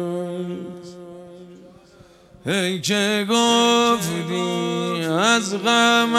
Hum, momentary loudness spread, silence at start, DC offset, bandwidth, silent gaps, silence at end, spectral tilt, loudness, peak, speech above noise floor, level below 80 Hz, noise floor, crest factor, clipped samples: none; 21 LU; 0 s; under 0.1%; 15.5 kHz; none; 0 s; -3.5 dB/octave; -19 LUFS; -2 dBFS; 30 dB; -62 dBFS; -49 dBFS; 20 dB; under 0.1%